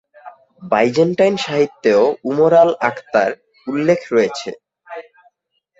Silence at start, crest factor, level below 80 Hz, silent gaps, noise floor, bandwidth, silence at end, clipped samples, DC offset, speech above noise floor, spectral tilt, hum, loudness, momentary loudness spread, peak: 0.25 s; 16 dB; -60 dBFS; none; -66 dBFS; 8 kHz; 0.8 s; under 0.1%; under 0.1%; 51 dB; -5.5 dB/octave; none; -16 LUFS; 18 LU; 0 dBFS